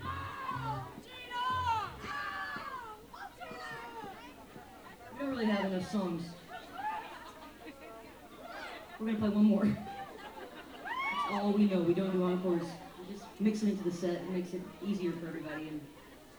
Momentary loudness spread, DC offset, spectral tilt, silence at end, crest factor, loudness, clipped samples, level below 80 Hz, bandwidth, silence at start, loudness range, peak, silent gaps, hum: 19 LU; under 0.1%; -6.5 dB/octave; 0 s; 18 dB; -35 LUFS; under 0.1%; -64 dBFS; over 20 kHz; 0 s; 9 LU; -18 dBFS; none; none